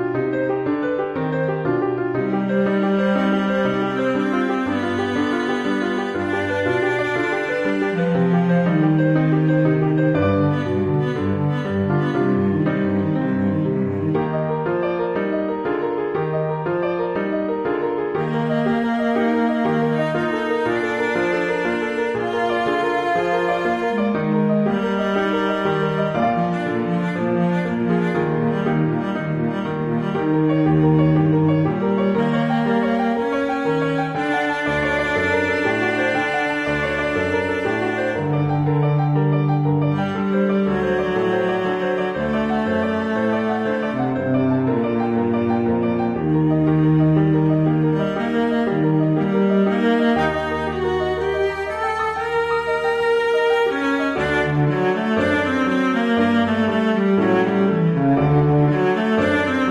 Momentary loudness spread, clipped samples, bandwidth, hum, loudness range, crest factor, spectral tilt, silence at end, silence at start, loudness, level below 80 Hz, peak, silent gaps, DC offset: 5 LU; under 0.1%; 9.2 kHz; none; 3 LU; 14 dB; -8 dB/octave; 0 s; 0 s; -20 LUFS; -48 dBFS; -6 dBFS; none; under 0.1%